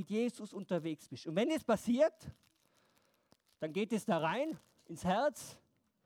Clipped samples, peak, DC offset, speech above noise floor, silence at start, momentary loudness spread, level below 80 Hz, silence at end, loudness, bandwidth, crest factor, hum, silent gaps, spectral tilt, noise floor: under 0.1%; -18 dBFS; under 0.1%; 38 dB; 0 s; 17 LU; -72 dBFS; 0.5 s; -36 LUFS; 17 kHz; 18 dB; none; none; -5.5 dB/octave; -74 dBFS